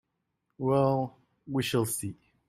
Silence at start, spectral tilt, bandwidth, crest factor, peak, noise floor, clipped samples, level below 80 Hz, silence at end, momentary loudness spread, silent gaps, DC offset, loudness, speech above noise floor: 0.6 s; -5.5 dB/octave; 16 kHz; 18 dB; -14 dBFS; -80 dBFS; under 0.1%; -64 dBFS; 0.35 s; 10 LU; none; under 0.1%; -29 LUFS; 52 dB